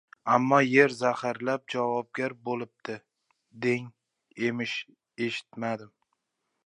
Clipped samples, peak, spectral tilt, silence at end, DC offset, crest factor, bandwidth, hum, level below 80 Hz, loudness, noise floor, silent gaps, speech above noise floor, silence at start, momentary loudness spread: under 0.1%; -6 dBFS; -5.5 dB/octave; 0.8 s; under 0.1%; 24 dB; 10.5 kHz; none; -80 dBFS; -28 LUFS; -81 dBFS; none; 53 dB; 0.25 s; 16 LU